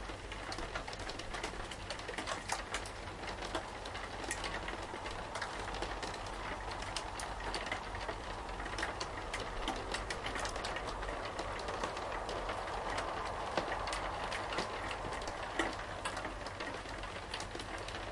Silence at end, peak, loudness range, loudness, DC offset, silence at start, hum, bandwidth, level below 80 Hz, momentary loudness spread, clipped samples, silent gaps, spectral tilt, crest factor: 0 s; -18 dBFS; 2 LU; -41 LUFS; under 0.1%; 0 s; none; 11.5 kHz; -50 dBFS; 5 LU; under 0.1%; none; -3 dB/octave; 24 dB